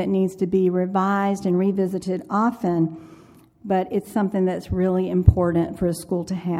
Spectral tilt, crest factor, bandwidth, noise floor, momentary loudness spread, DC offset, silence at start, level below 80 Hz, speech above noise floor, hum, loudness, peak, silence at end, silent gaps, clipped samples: -8 dB/octave; 20 dB; 14.5 kHz; -50 dBFS; 8 LU; under 0.1%; 0 s; -34 dBFS; 29 dB; none; -22 LUFS; 0 dBFS; 0 s; none; under 0.1%